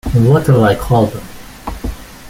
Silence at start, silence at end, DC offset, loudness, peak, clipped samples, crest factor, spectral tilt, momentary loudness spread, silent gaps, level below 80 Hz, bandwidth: 0.05 s; 0 s; under 0.1%; -12 LUFS; -2 dBFS; under 0.1%; 12 dB; -7.5 dB/octave; 19 LU; none; -30 dBFS; 16.5 kHz